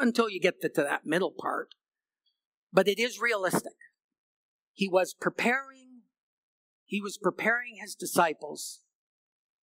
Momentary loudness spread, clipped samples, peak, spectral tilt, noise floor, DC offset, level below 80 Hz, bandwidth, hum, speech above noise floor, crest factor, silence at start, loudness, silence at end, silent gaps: 12 LU; under 0.1%; -6 dBFS; -4 dB/octave; -80 dBFS; under 0.1%; -84 dBFS; 16 kHz; none; 51 dB; 26 dB; 0 s; -29 LUFS; 0.9 s; 2.45-2.67 s, 4.04-4.09 s, 4.18-4.75 s, 6.20-6.86 s